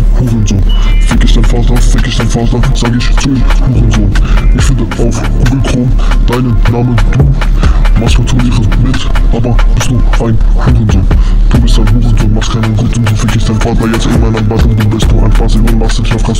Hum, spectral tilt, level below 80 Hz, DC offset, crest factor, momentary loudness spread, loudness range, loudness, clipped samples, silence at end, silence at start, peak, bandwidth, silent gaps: none; -6 dB/octave; -8 dBFS; under 0.1%; 6 dB; 2 LU; 1 LU; -10 LUFS; under 0.1%; 0 s; 0 s; 0 dBFS; 11.5 kHz; none